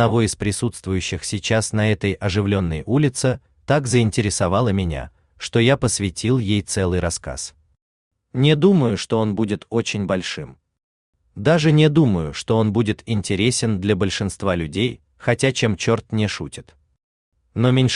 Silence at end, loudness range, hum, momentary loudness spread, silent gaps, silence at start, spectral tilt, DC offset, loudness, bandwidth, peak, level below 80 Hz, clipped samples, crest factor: 0 s; 3 LU; none; 11 LU; 7.82-8.11 s, 10.83-11.13 s, 17.03-17.32 s; 0 s; -5.5 dB/octave; under 0.1%; -20 LUFS; 12.5 kHz; -2 dBFS; -46 dBFS; under 0.1%; 18 dB